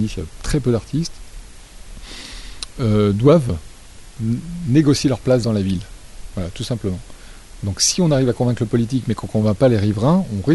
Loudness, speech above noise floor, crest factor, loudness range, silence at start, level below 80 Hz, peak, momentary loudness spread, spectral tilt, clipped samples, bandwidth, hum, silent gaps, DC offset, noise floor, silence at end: -19 LUFS; 21 dB; 16 dB; 3 LU; 0 s; -36 dBFS; -2 dBFS; 17 LU; -6 dB/octave; under 0.1%; 11.5 kHz; none; none; under 0.1%; -39 dBFS; 0 s